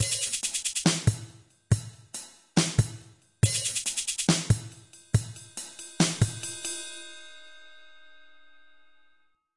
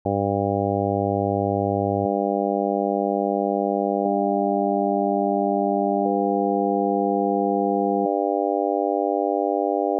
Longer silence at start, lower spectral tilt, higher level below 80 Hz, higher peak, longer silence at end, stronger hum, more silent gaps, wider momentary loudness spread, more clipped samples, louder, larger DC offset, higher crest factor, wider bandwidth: about the same, 0 s vs 0.05 s; first, -3.5 dB/octave vs 0 dB/octave; first, -50 dBFS vs -66 dBFS; about the same, -8 dBFS vs -10 dBFS; first, 1.4 s vs 0 s; neither; neither; first, 19 LU vs 1 LU; neither; second, -28 LUFS vs -22 LUFS; neither; first, 22 dB vs 12 dB; first, 11.5 kHz vs 1 kHz